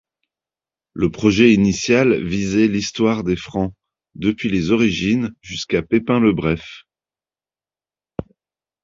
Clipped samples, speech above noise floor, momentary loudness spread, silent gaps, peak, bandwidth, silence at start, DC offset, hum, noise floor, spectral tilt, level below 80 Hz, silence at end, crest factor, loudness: under 0.1%; over 73 dB; 14 LU; none; -2 dBFS; 7.6 kHz; 0.95 s; under 0.1%; none; under -90 dBFS; -5.5 dB/octave; -44 dBFS; 0.6 s; 18 dB; -18 LUFS